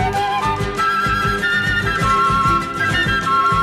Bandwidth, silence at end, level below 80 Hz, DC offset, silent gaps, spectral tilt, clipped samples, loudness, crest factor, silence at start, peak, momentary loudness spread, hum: 15.5 kHz; 0 s; -32 dBFS; under 0.1%; none; -4.5 dB/octave; under 0.1%; -17 LUFS; 12 dB; 0 s; -6 dBFS; 4 LU; none